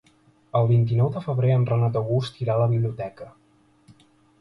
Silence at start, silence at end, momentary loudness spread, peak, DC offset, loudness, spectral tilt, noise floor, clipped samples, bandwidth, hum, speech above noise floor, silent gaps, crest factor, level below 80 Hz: 0.55 s; 1.1 s; 14 LU; -8 dBFS; under 0.1%; -23 LUFS; -9.5 dB/octave; -59 dBFS; under 0.1%; 6 kHz; none; 37 dB; none; 16 dB; -56 dBFS